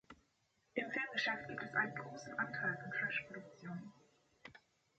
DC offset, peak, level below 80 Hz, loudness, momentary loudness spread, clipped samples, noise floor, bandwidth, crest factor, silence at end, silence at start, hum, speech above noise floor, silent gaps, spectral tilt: under 0.1%; -22 dBFS; -80 dBFS; -41 LUFS; 21 LU; under 0.1%; -79 dBFS; 8.4 kHz; 22 dB; 0.4 s; 0.1 s; none; 37 dB; none; -4.5 dB/octave